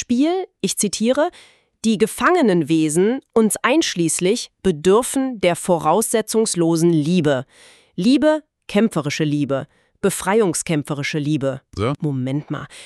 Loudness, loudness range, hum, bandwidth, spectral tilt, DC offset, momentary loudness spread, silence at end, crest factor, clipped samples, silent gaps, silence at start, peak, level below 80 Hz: -19 LUFS; 3 LU; none; 13.5 kHz; -5 dB/octave; under 0.1%; 7 LU; 0 s; 16 dB; under 0.1%; none; 0 s; -4 dBFS; -54 dBFS